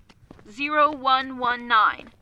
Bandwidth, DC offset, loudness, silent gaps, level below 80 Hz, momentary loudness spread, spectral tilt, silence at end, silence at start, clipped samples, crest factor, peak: 8.2 kHz; under 0.1%; -21 LUFS; none; -58 dBFS; 7 LU; -4 dB/octave; 0.15 s; 0.5 s; under 0.1%; 16 dB; -8 dBFS